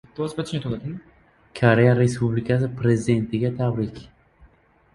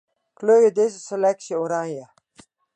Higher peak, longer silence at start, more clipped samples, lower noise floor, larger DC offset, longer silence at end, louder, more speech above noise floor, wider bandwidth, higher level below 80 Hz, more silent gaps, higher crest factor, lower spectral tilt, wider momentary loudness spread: first, -2 dBFS vs -6 dBFS; second, 0.2 s vs 0.4 s; neither; about the same, -56 dBFS vs -55 dBFS; neither; first, 0.9 s vs 0.7 s; about the same, -22 LUFS vs -21 LUFS; about the same, 35 dB vs 35 dB; first, 11.5 kHz vs 9.2 kHz; first, -50 dBFS vs -76 dBFS; neither; first, 22 dB vs 16 dB; first, -7.5 dB/octave vs -5 dB/octave; about the same, 14 LU vs 12 LU